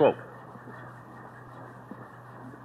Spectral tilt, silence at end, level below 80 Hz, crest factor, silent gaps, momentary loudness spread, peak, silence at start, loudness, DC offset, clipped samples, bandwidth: -8 dB/octave; 0 s; -70 dBFS; 24 dB; none; 6 LU; -10 dBFS; 0 s; -38 LUFS; under 0.1%; under 0.1%; 12 kHz